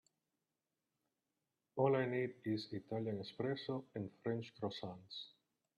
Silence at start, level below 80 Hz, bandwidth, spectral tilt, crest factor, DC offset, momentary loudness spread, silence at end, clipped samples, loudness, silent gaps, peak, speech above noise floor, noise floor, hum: 1.75 s; -84 dBFS; 11.5 kHz; -7.5 dB/octave; 22 dB; under 0.1%; 14 LU; 0.5 s; under 0.1%; -42 LUFS; none; -20 dBFS; over 49 dB; under -90 dBFS; none